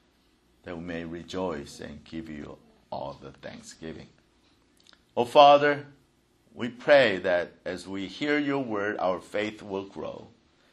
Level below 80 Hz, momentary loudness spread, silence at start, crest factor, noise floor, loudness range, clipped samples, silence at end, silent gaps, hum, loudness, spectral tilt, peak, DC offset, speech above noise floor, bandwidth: -62 dBFS; 22 LU; 0.65 s; 26 dB; -65 dBFS; 16 LU; under 0.1%; 0.45 s; none; none; -26 LUFS; -5 dB/octave; -2 dBFS; under 0.1%; 39 dB; 12 kHz